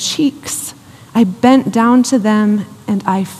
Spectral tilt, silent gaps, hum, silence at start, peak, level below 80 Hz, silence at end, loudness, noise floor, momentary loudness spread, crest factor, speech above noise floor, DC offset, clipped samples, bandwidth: -5 dB/octave; none; none; 0 s; 0 dBFS; -58 dBFS; 0 s; -14 LUFS; -34 dBFS; 11 LU; 14 dB; 21 dB; under 0.1%; under 0.1%; 15 kHz